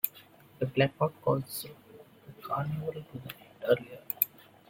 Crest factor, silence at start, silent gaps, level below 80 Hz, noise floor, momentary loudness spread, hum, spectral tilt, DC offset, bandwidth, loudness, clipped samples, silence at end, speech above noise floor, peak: 30 dB; 0.05 s; none; -68 dBFS; -56 dBFS; 16 LU; none; -6 dB/octave; under 0.1%; 16.5 kHz; -32 LUFS; under 0.1%; 0.45 s; 25 dB; -4 dBFS